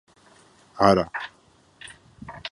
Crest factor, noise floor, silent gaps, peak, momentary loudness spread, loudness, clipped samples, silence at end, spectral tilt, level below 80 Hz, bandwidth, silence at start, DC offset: 24 dB; -55 dBFS; none; -2 dBFS; 25 LU; -22 LUFS; under 0.1%; 0.05 s; -6 dB/octave; -52 dBFS; 11.5 kHz; 0.75 s; under 0.1%